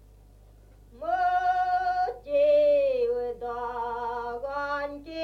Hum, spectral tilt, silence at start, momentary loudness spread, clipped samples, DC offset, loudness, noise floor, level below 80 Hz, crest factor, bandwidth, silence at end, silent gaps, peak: 50 Hz at -55 dBFS; -5 dB/octave; 0.9 s; 12 LU; under 0.1%; under 0.1%; -27 LUFS; -53 dBFS; -54 dBFS; 12 dB; 6.4 kHz; 0 s; none; -14 dBFS